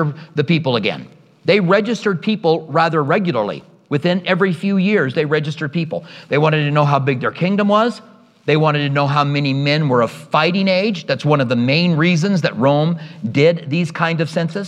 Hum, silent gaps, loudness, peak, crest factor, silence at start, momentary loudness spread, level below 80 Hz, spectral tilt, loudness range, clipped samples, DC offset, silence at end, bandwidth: none; none; -17 LUFS; 0 dBFS; 16 dB; 0 s; 7 LU; -66 dBFS; -7 dB/octave; 2 LU; under 0.1%; under 0.1%; 0 s; 9.8 kHz